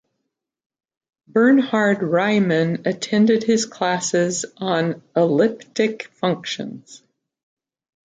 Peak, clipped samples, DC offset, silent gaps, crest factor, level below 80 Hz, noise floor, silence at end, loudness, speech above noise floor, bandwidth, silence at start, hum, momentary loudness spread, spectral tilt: -4 dBFS; under 0.1%; under 0.1%; none; 16 dB; -68 dBFS; -79 dBFS; 1.15 s; -20 LUFS; 60 dB; 9.4 kHz; 1.35 s; none; 9 LU; -5 dB/octave